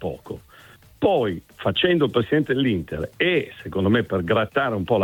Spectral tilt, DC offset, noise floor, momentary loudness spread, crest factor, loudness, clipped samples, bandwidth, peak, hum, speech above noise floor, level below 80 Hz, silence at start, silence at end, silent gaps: -7.5 dB/octave; under 0.1%; -49 dBFS; 11 LU; 16 dB; -22 LUFS; under 0.1%; 18 kHz; -6 dBFS; none; 27 dB; -50 dBFS; 0 s; 0 s; none